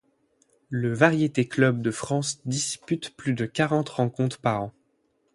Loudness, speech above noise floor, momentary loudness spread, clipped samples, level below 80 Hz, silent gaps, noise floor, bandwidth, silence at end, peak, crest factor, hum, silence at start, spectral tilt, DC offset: -25 LUFS; 45 dB; 9 LU; under 0.1%; -62 dBFS; none; -70 dBFS; 11.5 kHz; 0.65 s; -4 dBFS; 22 dB; none; 0.7 s; -5 dB/octave; under 0.1%